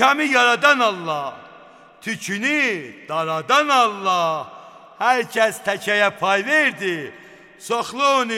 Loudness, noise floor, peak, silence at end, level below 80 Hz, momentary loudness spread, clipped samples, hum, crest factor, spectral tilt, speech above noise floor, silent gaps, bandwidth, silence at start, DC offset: -19 LUFS; -46 dBFS; 0 dBFS; 0 s; -72 dBFS; 14 LU; under 0.1%; none; 20 dB; -3 dB/octave; 26 dB; none; 17 kHz; 0 s; under 0.1%